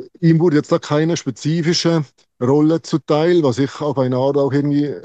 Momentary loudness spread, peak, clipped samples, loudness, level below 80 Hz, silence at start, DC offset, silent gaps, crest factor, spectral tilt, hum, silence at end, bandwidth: 6 LU; -2 dBFS; under 0.1%; -17 LUFS; -62 dBFS; 0 s; under 0.1%; none; 14 dB; -6.5 dB/octave; none; 0.05 s; 8.4 kHz